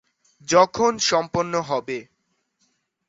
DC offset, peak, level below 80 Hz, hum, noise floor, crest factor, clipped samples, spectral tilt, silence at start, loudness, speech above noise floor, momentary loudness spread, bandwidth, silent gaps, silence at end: under 0.1%; -2 dBFS; -58 dBFS; none; -72 dBFS; 22 dB; under 0.1%; -3 dB/octave; 0.5 s; -21 LUFS; 51 dB; 15 LU; 8 kHz; none; 1.05 s